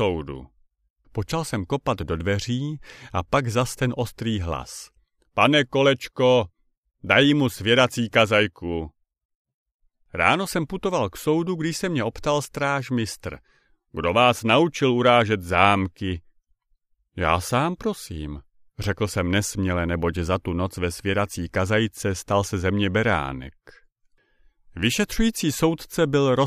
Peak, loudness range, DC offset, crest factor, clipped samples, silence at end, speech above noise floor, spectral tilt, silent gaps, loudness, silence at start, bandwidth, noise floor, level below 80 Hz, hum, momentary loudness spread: -2 dBFS; 6 LU; under 0.1%; 22 dB; under 0.1%; 0 s; 45 dB; -5 dB/octave; 0.90-0.96 s, 6.77-6.83 s, 9.25-9.29 s, 9.35-9.45 s, 9.54-9.79 s; -23 LUFS; 0 s; 15.5 kHz; -67 dBFS; -44 dBFS; none; 14 LU